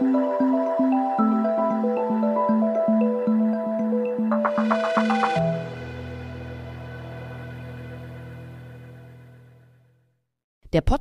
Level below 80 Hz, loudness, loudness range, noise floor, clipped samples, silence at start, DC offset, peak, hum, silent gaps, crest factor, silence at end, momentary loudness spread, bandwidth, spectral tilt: -40 dBFS; -22 LUFS; 18 LU; -68 dBFS; under 0.1%; 0 s; under 0.1%; -6 dBFS; none; 10.44-10.61 s; 18 dB; 0 s; 17 LU; 8.4 kHz; -8 dB/octave